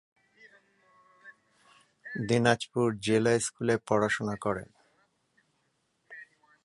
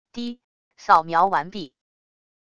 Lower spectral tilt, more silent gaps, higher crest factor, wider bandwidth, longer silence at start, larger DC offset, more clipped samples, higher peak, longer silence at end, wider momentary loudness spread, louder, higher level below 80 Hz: about the same, -5 dB/octave vs -5 dB/octave; second, none vs 0.44-0.71 s; about the same, 24 dB vs 22 dB; first, 11.5 kHz vs 8.4 kHz; first, 1.25 s vs 0.15 s; neither; neither; second, -8 dBFS vs -2 dBFS; second, 0.4 s vs 0.8 s; first, 23 LU vs 19 LU; second, -28 LUFS vs -19 LUFS; about the same, -66 dBFS vs -64 dBFS